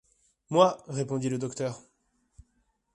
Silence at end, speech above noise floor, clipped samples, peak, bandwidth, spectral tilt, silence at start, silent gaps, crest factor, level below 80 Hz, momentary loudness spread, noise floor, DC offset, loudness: 1.15 s; 46 dB; under 0.1%; -6 dBFS; 11.5 kHz; -6 dB/octave; 0.5 s; none; 24 dB; -64 dBFS; 12 LU; -73 dBFS; under 0.1%; -28 LUFS